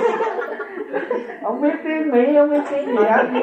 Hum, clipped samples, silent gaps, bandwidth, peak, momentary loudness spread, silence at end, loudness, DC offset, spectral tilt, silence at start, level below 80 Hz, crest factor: none; under 0.1%; none; 8.4 kHz; -2 dBFS; 11 LU; 0 s; -19 LUFS; under 0.1%; -6.5 dB/octave; 0 s; -72 dBFS; 16 dB